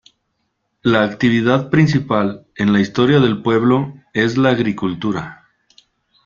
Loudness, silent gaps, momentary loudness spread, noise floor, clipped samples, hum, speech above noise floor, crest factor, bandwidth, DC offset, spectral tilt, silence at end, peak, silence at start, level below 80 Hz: -16 LUFS; none; 8 LU; -70 dBFS; under 0.1%; none; 55 dB; 16 dB; 7.4 kHz; under 0.1%; -7 dB/octave; 0.9 s; -2 dBFS; 0.85 s; -50 dBFS